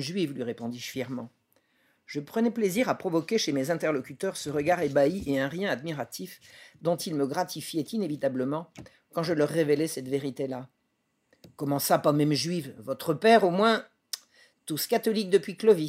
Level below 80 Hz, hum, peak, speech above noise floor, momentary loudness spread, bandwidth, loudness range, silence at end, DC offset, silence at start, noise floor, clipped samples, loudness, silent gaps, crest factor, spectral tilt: -66 dBFS; none; -8 dBFS; 48 dB; 14 LU; 16 kHz; 6 LU; 0 s; under 0.1%; 0 s; -75 dBFS; under 0.1%; -28 LUFS; none; 20 dB; -5 dB/octave